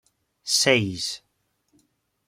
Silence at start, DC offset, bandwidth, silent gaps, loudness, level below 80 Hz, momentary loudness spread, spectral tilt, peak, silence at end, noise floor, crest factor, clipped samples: 0.45 s; under 0.1%; 16.5 kHz; none; -22 LUFS; -66 dBFS; 20 LU; -2.5 dB/octave; -4 dBFS; 1.1 s; -70 dBFS; 24 dB; under 0.1%